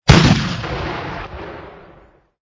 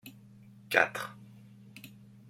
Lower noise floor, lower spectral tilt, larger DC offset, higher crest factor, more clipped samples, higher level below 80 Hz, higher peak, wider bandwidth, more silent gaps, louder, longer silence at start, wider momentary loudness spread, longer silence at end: second, -49 dBFS vs -55 dBFS; first, -5.5 dB/octave vs -3.5 dB/octave; neither; second, 18 dB vs 30 dB; first, 0.2% vs under 0.1%; first, -28 dBFS vs -76 dBFS; first, 0 dBFS vs -6 dBFS; second, 8 kHz vs 16.5 kHz; neither; first, -17 LUFS vs -30 LUFS; about the same, 0.05 s vs 0.05 s; about the same, 23 LU vs 25 LU; first, 0.8 s vs 0.4 s